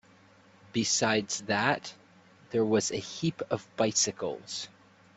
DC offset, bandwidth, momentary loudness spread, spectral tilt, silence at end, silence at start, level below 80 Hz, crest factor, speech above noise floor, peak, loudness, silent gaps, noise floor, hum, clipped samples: under 0.1%; 8.4 kHz; 11 LU; -3 dB/octave; 0.5 s; 0.75 s; -68 dBFS; 22 dB; 29 dB; -10 dBFS; -29 LUFS; none; -59 dBFS; none; under 0.1%